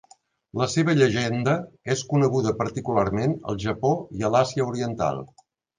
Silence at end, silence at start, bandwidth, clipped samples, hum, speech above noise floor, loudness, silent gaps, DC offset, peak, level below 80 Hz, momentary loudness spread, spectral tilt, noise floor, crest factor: 0.55 s; 0.55 s; 9.8 kHz; under 0.1%; none; 33 dB; -24 LUFS; none; under 0.1%; -6 dBFS; -52 dBFS; 7 LU; -6 dB/octave; -56 dBFS; 18 dB